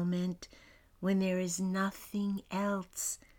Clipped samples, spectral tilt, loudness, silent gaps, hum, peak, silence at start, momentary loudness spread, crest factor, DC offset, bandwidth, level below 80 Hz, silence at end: under 0.1%; -5 dB/octave; -35 LUFS; none; none; -20 dBFS; 0 s; 7 LU; 14 dB; under 0.1%; 18 kHz; -64 dBFS; 0.2 s